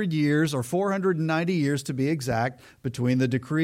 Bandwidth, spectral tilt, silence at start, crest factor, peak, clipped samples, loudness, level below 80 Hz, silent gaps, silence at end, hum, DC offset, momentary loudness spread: 16.5 kHz; -6.5 dB/octave; 0 s; 12 dB; -12 dBFS; under 0.1%; -25 LUFS; -58 dBFS; none; 0 s; none; under 0.1%; 5 LU